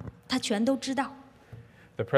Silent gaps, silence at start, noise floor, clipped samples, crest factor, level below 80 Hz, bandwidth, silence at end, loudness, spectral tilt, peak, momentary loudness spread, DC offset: none; 0 s; -50 dBFS; under 0.1%; 22 dB; -62 dBFS; 13.5 kHz; 0 s; -30 LUFS; -4.5 dB/octave; -8 dBFS; 23 LU; under 0.1%